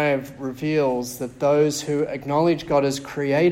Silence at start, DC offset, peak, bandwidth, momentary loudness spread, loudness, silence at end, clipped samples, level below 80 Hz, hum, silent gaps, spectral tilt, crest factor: 0 s; under 0.1%; -8 dBFS; 16.5 kHz; 7 LU; -22 LUFS; 0 s; under 0.1%; -54 dBFS; none; none; -5.5 dB/octave; 14 dB